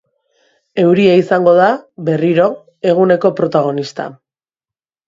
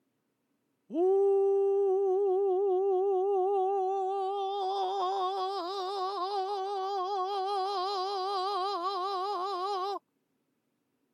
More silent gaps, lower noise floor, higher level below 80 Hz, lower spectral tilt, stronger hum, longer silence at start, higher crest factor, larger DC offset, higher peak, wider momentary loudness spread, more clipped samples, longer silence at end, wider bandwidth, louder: neither; first, -90 dBFS vs -78 dBFS; first, -60 dBFS vs under -90 dBFS; first, -7.5 dB/octave vs -3.5 dB/octave; neither; second, 0.75 s vs 0.9 s; about the same, 14 dB vs 10 dB; neither; first, 0 dBFS vs -20 dBFS; first, 12 LU vs 7 LU; neither; second, 0.95 s vs 1.15 s; second, 7.6 kHz vs 10 kHz; first, -13 LUFS vs -30 LUFS